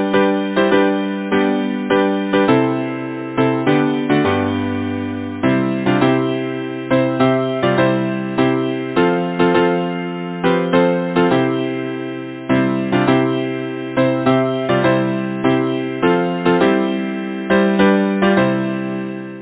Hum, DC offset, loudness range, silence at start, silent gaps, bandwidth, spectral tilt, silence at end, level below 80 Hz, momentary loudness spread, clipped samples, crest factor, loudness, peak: none; under 0.1%; 2 LU; 0 s; none; 4 kHz; -11 dB/octave; 0 s; -50 dBFS; 8 LU; under 0.1%; 16 dB; -17 LUFS; 0 dBFS